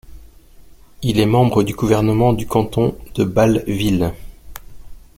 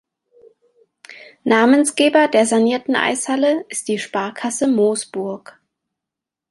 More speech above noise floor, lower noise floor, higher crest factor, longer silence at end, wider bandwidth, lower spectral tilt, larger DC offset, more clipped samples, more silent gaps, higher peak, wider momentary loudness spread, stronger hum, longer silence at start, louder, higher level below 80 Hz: second, 27 dB vs 68 dB; second, -43 dBFS vs -85 dBFS; about the same, 16 dB vs 16 dB; second, 0.2 s vs 1.15 s; first, 16.5 kHz vs 11.5 kHz; first, -7 dB/octave vs -3.5 dB/octave; neither; neither; neither; about the same, -2 dBFS vs -2 dBFS; second, 7 LU vs 12 LU; neither; second, 0.1 s vs 1.1 s; about the same, -17 LUFS vs -17 LUFS; first, -38 dBFS vs -68 dBFS